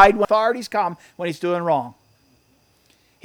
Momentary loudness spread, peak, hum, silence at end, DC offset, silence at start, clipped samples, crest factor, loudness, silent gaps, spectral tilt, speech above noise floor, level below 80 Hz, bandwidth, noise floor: 11 LU; 0 dBFS; none; 1.35 s; under 0.1%; 0 s; under 0.1%; 20 dB; -21 LUFS; none; -5.5 dB/octave; 41 dB; -46 dBFS; 18.5 kHz; -60 dBFS